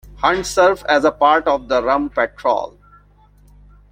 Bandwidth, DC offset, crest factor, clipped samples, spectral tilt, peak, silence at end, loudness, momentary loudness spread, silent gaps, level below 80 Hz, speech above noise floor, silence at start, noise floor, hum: 16 kHz; under 0.1%; 18 dB; under 0.1%; -3.5 dB/octave; 0 dBFS; 1.2 s; -16 LUFS; 6 LU; none; -44 dBFS; 33 dB; 0.2 s; -50 dBFS; 50 Hz at -45 dBFS